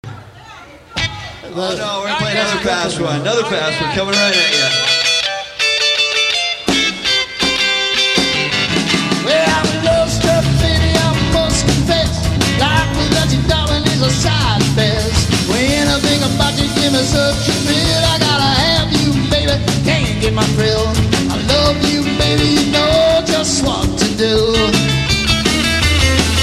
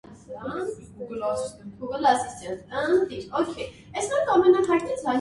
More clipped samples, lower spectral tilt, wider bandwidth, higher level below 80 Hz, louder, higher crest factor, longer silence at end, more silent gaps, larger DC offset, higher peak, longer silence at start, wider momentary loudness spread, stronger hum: neither; about the same, -4 dB/octave vs -4.5 dB/octave; first, 15.5 kHz vs 11.5 kHz; first, -26 dBFS vs -58 dBFS; first, -13 LUFS vs -25 LUFS; about the same, 14 dB vs 18 dB; about the same, 0 s vs 0 s; neither; neither; first, 0 dBFS vs -6 dBFS; about the same, 0.05 s vs 0.05 s; second, 5 LU vs 17 LU; neither